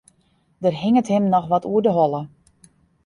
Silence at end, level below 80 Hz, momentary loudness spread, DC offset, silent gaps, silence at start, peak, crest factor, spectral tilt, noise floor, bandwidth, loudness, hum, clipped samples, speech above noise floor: 0.8 s; -60 dBFS; 7 LU; under 0.1%; none; 0.6 s; -6 dBFS; 16 dB; -8 dB/octave; -62 dBFS; 11 kHz; -20 LUFS; none; under 0.1%; 44 dB